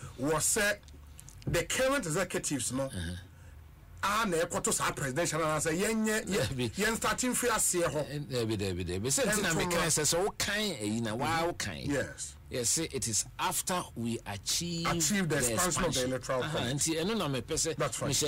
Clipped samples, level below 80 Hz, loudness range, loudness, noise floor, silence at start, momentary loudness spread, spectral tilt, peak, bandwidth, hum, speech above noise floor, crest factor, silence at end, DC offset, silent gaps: under 0.1%; -52 dBFS; 3 LU; -31 LUFS; -51 dBFS; 0 s; 8 LU; -3 dB/octave; -18 dBFS; 16 kHz; none; 20 dB; 14 dB; 0 s; under 0.1%; none